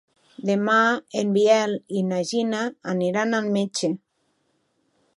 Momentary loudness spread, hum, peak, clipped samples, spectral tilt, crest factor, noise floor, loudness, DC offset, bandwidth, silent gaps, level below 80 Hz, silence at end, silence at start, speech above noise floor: 9 LU; none; -6 dBFS; under 0.1%; -5 dB/octave; 18 dB; -70 dBFS; -23 LUFS; under 0.1%; 11.5 kHz; none; -76 dBFS; 1.2 s; 0.4 s; 48 dB